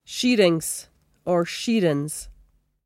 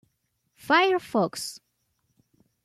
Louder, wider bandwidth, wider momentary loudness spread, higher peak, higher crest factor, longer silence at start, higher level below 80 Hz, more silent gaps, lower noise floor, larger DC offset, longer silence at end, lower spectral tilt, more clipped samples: about the same, -23 LUFS vs -24 LUFS; first, 16.5 kHz vs 14 kHz; about the same, 15 LU vs 14 LU; first, -6 dBFS vs -10 dBFS; about the same, 18 dB vs 20 dB; second, 0.1 s vs 0.65 s; first, -54 dBFS vs -72 dBFS; neither; second, -58 dBFS vs -75 dBFS; neither; second, 0.55 s vs 1.1 s; about the same, -4.5 dB/octave vs -3.5 dB/octave; neither